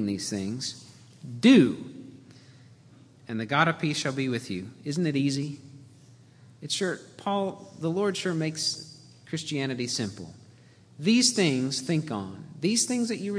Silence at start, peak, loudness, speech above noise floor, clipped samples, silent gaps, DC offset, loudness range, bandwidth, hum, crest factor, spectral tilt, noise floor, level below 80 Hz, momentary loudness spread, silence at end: 0 s; -6 dBFS; -27 LUFS; 28 dB; under 0.1%; none; under 0.1%; 5 LU; 11 kHz; none; 22 dB; -4 dB/octave; -54 dBFS; -72 dBFS; 18 LU; 0 s